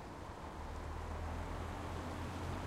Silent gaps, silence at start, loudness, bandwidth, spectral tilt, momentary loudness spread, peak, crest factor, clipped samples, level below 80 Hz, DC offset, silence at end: none; 0 s; -45 LUFS; 15 kHz; -6 dB/octave; 5 LU; -30 dBFS; 14 dB; under 0.1%; -50 dBFS; under 0.1%; 0 s